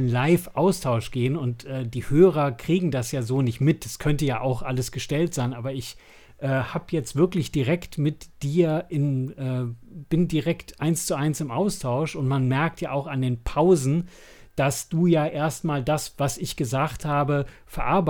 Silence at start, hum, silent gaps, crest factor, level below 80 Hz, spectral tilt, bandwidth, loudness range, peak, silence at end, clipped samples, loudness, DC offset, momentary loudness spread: 0 s; none; none; 18 dB; -44 dBFS; -6.5 dB/octave; 19.5 kHz; 3 LU; -4 dBFS; 0 s; under 0.1%; -25 LUFS; under 0.1%; 8 LU